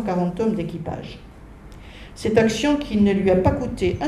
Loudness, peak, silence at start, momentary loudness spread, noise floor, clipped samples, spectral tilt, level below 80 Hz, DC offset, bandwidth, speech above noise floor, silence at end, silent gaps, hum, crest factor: -21 LUFS; -4 dBFS; 0 s; 22 LU; -41 dBFS; under 0.1%; -6.5 dB/octave; -40 dBFS; under 0.1%; 13 kHz; 21 dB; 0 s; none; none; 18 dB